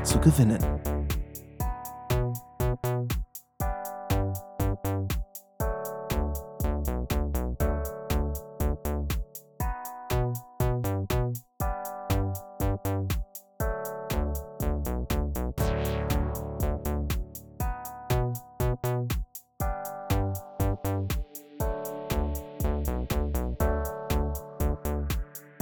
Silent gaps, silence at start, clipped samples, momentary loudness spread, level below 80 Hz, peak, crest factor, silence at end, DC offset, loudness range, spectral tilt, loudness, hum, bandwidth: none; 0 s; under 0.1%; 6 LU; -34 dBFS; -6 dBFS; 24 dB; 0.05 s; under 0.1%; 1 LU; -6 dB/octave; -31 LUFS; none; over 20 kHz